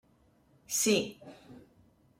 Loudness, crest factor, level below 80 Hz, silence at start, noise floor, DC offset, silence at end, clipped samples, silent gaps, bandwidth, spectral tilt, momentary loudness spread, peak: -30 LUFS; 22 dB; -70 dBFS; 0.7 s; -66 dBFS; under 0.1%; 0.6 s; under 0.1%; none; 16 kHz; -2.5 dB/octave; 25 LU; -14 dBFS